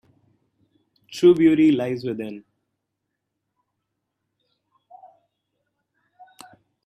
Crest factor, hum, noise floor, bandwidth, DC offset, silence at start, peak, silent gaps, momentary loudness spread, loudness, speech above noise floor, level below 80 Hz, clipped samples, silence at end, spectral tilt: 20 dB; none; -80 dBFS; 11 kHz; under 0.1%; 1.1 s; -4 dBFS; none; 21 LU; -19 LUFS; 62 dB; -68 dBFS; under 0.1%; 4.45 s; -7 dB/octave